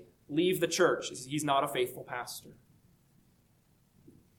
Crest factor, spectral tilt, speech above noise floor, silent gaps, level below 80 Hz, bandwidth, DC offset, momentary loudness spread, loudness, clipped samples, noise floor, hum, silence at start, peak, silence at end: 20 dB; -4 dB/octave; 36 dB; none; -72 dBFS; 19 kHz; under 0.1%; 12 LU; -31 LUFS; under 0.1%; -68 dBFS; none; 0 s; -14 dBFS; 1.85 s